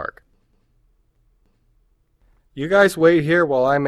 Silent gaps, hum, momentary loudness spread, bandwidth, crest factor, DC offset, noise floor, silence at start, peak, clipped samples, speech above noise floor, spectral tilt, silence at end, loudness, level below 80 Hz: none; none; 18 LU; 14.5 kHz; 18 dB; under 0.1%; -62 dBFS; 0 s; -2 dBFS; under 0.1%; 46 dB; -6 dB/octave; 0 s; -16 LUFS; -54 dBFS